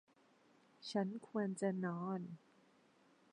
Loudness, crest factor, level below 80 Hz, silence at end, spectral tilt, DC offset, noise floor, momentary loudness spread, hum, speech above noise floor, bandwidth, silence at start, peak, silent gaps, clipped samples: -42 LUFS; 20 dB; under -90 dBFS; 0.95 s; -6.5 dB/octave; under 0.1%; -71 dBFS; 14 LU; none; 30 dB; 10 kHz; 0.8 s; -24 dBFS; none; under 0.1%